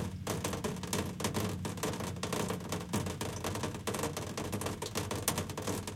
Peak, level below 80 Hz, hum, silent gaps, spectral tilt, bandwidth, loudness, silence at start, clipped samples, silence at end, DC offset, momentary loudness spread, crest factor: -14 dBFS; -58 dBFS; none; none; -4 dB/octave; 17 kHz; -37 LUFS; 0 s; under 0.1%; 0 s; under 0.1%; 4 LU; 24 dB